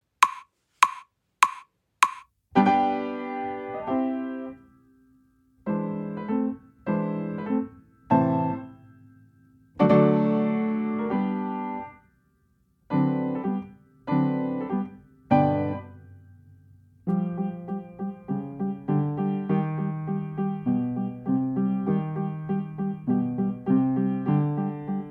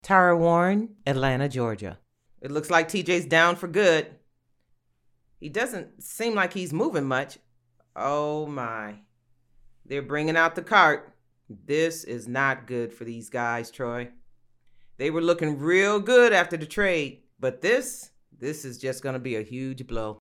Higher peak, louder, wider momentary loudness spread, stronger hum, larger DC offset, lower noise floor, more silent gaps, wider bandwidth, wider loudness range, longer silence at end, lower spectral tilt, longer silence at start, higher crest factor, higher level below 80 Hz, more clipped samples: about the same, -2 dBFS vs -4 dBFS; about the same, -26 LUFS vs -25 LUFS; second, 13 LU vs 16 LU; neither; neither; about the same, -66 dBFS vs -68 dBFS; neither; about the same, 15.5 kHz vs 16 kHz; about the same, 6 LU vs 7 LU; about the same, 0 s vs 0.05 s; first, -7 dB/octave vs -5 dB/octave; first, 0.2 s vs 0.05 s; about the same, 24 dB vs 22 dB; second, -64 dBFS vs -56 dBFS; neither